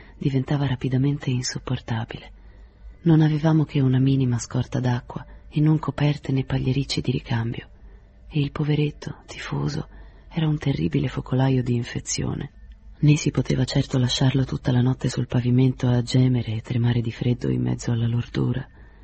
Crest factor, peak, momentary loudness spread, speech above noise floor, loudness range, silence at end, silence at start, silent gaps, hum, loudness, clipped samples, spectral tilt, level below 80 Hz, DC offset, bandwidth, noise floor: 16 dB; -6 dBFS; 10 LU; 24 dB; 5 LU; 0.2 s; 0 s; none; none; -23 LUFS; under 0.1%; -6.5 dB/octave; -44 dBFS; under 0.1%; 8.4 kHz; -46 dBFS